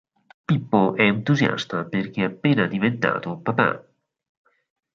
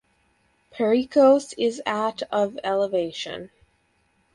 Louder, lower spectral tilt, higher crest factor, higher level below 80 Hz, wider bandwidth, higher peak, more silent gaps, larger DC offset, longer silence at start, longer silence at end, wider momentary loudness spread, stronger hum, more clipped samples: about the same, -22 LUFS vs -23 LUFS; first, -7 dB/octave vs -4.5 dB/octave; about the same, 20 dB vs 18 dB; about the same, -62 dBFS vs -66 dBFS; second, 7.4 kHz vs 11 kHz; first, -2 dBFS vs -6 dBFS; neither; neither; second, 0.5 s vs 0.75 s; first, 1.15 s vs 0.9 s; second, 8 LU vs 13 LU; neither; neither